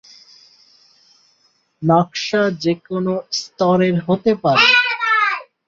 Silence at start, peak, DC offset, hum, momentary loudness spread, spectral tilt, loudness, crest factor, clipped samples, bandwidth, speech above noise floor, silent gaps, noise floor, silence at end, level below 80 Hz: 1.8 s; -2 dBFS; under 0.1%; none; 10 LU; -5 dB/octave; -16 LUFS; 18 dB; under 0.1%; 7.6 kHz; 44 dB; none; -61 dBFS; 0.25 s; -60 dBFS